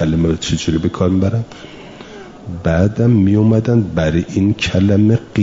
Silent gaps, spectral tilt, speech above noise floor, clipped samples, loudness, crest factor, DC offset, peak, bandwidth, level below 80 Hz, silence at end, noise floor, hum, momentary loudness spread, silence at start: none; -7 dB/octave; 20 dB; under 0.1%; -15 LUFS; 12 dB; 0.2%; -2 dBFS; 7.8 kHz; -38 dBFS; 0 s; -34 dBFS; none; 22 LU; 0 s